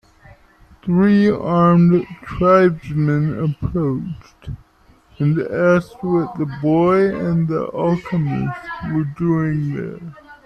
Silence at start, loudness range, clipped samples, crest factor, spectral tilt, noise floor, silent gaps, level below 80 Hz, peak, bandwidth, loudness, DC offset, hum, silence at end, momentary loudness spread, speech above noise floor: 0.85 s; 5 LU; under 0.1%; 16 dB; -9.5 dB/octave; -52 dBFS; none; -44 dBFS; -2 dBFS; 6.2 kHz; -18 LUFS; under 0.1%; none; 0.1 s; 17 LU; 35 dB